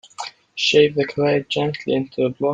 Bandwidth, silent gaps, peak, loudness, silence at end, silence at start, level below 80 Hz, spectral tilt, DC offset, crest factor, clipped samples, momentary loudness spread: 9 kHz; none; -2 dBFS; -19 LUFS; 0 s; 0.2 s; -60 dBFS; -5 dB/octave; under 0.1%; 18 dB; under 0.1%; 15 LU